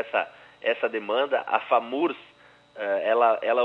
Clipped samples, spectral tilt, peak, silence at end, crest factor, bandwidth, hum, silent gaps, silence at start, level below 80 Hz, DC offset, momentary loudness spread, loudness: under 0.1%; -5.5 dB/octave; -6 dBFS; 0 s; 20 dB; 5.6 kHz; 60 Hz at -70 dBFS; none; 0 s; -78 dBFS; under 0.1%; 10 LU; -25 LUFS